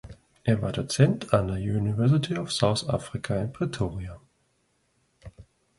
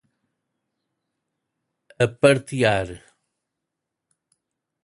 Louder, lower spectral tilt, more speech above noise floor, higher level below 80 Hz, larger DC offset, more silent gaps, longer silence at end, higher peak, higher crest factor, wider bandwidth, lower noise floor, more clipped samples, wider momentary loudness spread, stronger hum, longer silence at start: second, -26 LUFS vs -20 LUFS; about the same, -6 dB/octave vs -5.5 dB/octave; second, 45 dB vs 63 dB; first, -48 dBFS vs -54 dBFS; neither; neither; second, 0.35 s vs 1.9 s; second, -6 dBFS vs -2 dBFS; about the same, 22 dB vs 24 dB; about the same, 11.5 kHz vs 11.5 kHz; second, -70 dBFS vs -83 dBFS; neither; about the same, 8 LU vs 8 LU; neither; second, 0.05 s vs 2 s